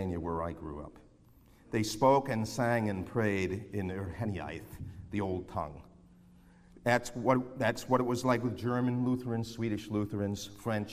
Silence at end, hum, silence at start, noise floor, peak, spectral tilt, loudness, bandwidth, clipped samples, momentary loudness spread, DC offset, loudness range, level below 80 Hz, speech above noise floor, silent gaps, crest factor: 0 s; none; 0 s; -60 dBFS; -12 dBFS; -6 dB/octave; -33 LUFS; 15.5 kHz; under 0.1%; 13 LU; under 0.1%; 5 LU; -58 dBFS; 28 dB; none; 20 dB